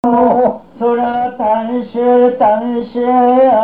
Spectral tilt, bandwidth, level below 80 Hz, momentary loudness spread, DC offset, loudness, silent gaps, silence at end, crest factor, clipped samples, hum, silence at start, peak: -9 dB/octave; 4.5 kHz; -50 dBFS; 7 LU; 0.4%; -13 LUFS; none; 0 s; 10 dB; under 0.1%; none; 0.05 s; -2 dBFS